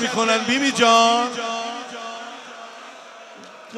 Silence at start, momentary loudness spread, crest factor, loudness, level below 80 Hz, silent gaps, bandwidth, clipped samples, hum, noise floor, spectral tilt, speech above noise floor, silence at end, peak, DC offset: 0 s; 26 LU; 18 dB; -18 LUFS; -76 dBFS; none; 14 kHz; under 0.1%; none; -41 dBFS; -2 dB/octave; 24 dB; 0 s; -2 dBFS; under 0.1%